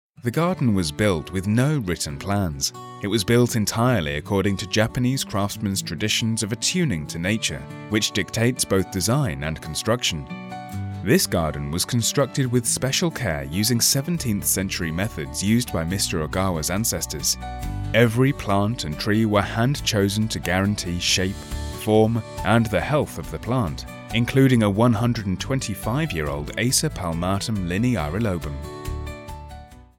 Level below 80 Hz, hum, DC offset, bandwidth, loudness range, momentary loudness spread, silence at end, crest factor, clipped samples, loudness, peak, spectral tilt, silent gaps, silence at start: -40 dBFS; none; under 0.1%; 17 kHz; 2 LU; 10 LU; 0.15 s; 20 dB; under 0.1%; -22 LUFS; -2 dBFS; -4.5 dB/octave; none; 0.2 s